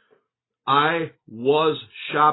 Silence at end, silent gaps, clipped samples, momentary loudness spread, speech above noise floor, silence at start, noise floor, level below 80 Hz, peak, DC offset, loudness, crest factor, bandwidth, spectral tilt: 0 s; none; under 0.1%; 13 LU; 52 dB; 0.65 s; -73 dBFS; -68 dBFS; -6 dBFS; under 0.1%; -21 LUFS; 16 dB; 4.1 kHz; -9.5 dB/octave